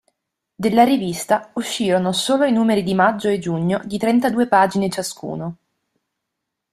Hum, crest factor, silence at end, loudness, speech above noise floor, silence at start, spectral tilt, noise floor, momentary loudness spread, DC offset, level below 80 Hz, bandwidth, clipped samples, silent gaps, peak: none; 18 dB; 1.2 s; -19 LUFS; 61 dB; 0.6 s; -5 dB/octave; -80 dBFS; 10 LU; under 0.1%; -58 dBFS; 14.5 kHz; under 0.1%; none; -2 dBFS